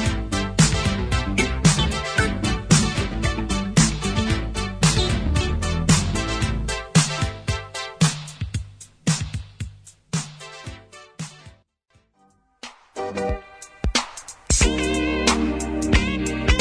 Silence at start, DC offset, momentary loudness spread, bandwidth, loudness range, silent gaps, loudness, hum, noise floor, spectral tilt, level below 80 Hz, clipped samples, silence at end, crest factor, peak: 0 s; under 0.1%; 18 LU; 11 kHz; 14 LU; none; -22 LUFS; none; -62 dBFS; -4 dB/octave; -30 dBFS; under 0.1%; 0 s; 20 dB; -4 dBFS